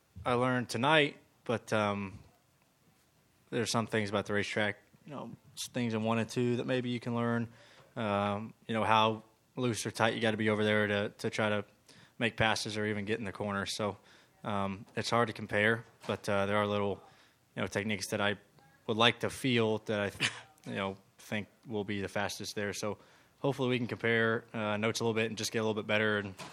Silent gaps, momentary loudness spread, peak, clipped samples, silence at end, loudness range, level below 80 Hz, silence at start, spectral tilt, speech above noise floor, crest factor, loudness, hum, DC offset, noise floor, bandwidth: none; 12 LU; -8 dBFS; under 0.1%; 0 s; 4 LU; -70 dBFS; 0.15 s; -4.5 dB/octave; 37 dB; 24 dB; -33 LUFS; none; under 0.1%; -69 dBFS; 16 kHz